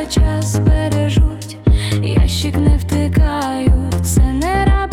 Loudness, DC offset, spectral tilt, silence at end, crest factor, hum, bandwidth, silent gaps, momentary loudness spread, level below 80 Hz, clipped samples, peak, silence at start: -16 LUFS; under 0.1%; -6 dB/octave; 0 s; 12 dB; none; 15.5 kHz; none; 2 LU; -18 dBFS; under 0.1%; -2 dBFS; 0 s